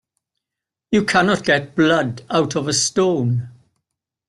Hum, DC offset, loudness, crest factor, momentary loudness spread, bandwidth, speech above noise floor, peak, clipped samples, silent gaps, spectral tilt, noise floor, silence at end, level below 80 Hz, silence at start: none; under 0.1%; -18 LUFS; 16 dB; 5 LU; 12.5 kHz; 68 dB; -2 dBFS; under 0.1%; none; -4 dB/octave; -85 dBFS; 0.8 s; -56 dBFS; 0.9 s